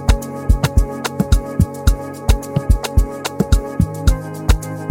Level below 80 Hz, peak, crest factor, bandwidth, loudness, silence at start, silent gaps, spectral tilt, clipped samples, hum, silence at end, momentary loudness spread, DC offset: -18 dBFS; 0 dBFS; 16 dB; 17 kHz; -19 LUFS; 0 s; none; -6 dB/octave; under 0.1%; none; 0 s; 5 LU; under 0.1%